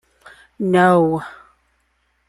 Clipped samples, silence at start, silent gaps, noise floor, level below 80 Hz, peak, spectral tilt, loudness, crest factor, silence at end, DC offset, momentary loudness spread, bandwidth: under 0.1%; 0.6 s; none; -65 dBFS; -58 dBFS; -2 dBFS; -7.5 dB/octave; -16 LUFS; 18 dB; 1 s; under 0.1%; 14 LU; 12 kHz